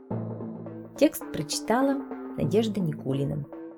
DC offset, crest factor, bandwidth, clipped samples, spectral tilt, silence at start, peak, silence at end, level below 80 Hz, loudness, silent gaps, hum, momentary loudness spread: under 0.1%; 20 dB; 19.5 kHz; under 0.1%; -5.5 dB/octave; 0 s; -8 dBFS; 0 s; -58 dBFS; -28 LUFS; none; none; 12 LU